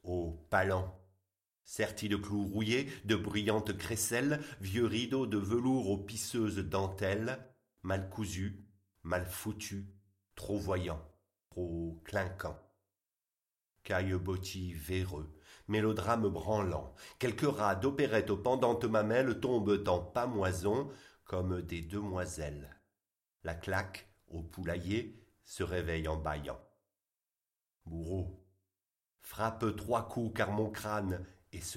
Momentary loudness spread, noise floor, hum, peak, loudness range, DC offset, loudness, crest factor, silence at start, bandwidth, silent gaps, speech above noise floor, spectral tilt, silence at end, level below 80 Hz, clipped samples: 14 LU; under -90 dBFS; none; -14 dBFS; 8 LU; under 0.1%; -36 LUFS; 22 dB; 0.05 s; 16.5 kHz; none; over 55 dB; -5.5 dB/octave; 0 s; -56 dBFS; under 0.1%